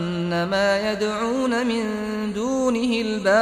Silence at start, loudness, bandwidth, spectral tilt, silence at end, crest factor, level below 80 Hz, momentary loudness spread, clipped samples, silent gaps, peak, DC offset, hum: 0 s; -22 LUFS; 14.5 kHz; -5 dB/octave; 0 s; 16 dB; -52 dBFS; 5 LU; under 0.1%; none; -6 dBFS; under 0.1%; none